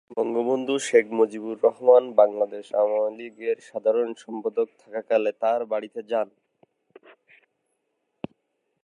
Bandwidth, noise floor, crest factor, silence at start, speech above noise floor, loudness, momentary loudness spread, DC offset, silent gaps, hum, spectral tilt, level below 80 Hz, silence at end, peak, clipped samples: 11.5 kHz; -76 dBFS; 20 dB; 0.1 s; 53 dB; -24 LUFS; 13 LU; under 0.1%; none; none; -4.5 dB/octave; -78 dBFS; 2.6 s; -4 dBFS; under 0.1%